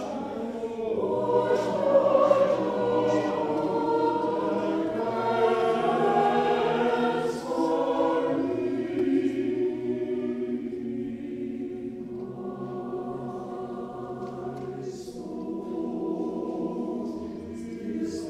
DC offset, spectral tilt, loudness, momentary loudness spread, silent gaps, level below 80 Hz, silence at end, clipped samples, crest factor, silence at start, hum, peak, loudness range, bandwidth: under 0.1%; -6.5 dB/octave; -27 LUFS; 13 LU; none; -62 dBFS; 0 s; under 0.1%; 20 dB; 0 s; none; -8 dBFS; 11 LU; 11.5 kHz